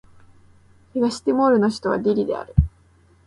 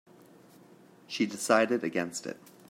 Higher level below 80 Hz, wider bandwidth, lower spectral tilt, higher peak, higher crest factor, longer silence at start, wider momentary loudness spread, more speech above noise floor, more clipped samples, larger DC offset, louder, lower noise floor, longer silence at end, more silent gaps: first, -34 dBFS vs -80 dBFS; second, 11.5 kHz vs 16 kHz; first, -7.5 dB/octave vs -3.5 dB/octave; first, -2 dBFS vs -10 dBFS; about the same, 20 dB vs 24 dB; second, 0.95 s vs 1.1 s; second, 6 LU vs 15 LU; first, 36 dB vs 27 dB; neither; neither; first, -21 LUFS vs -29 LUFS; about the same, -55 dBFS vs -57 dBFS; first, 0.6 s vs 0.35 s; neither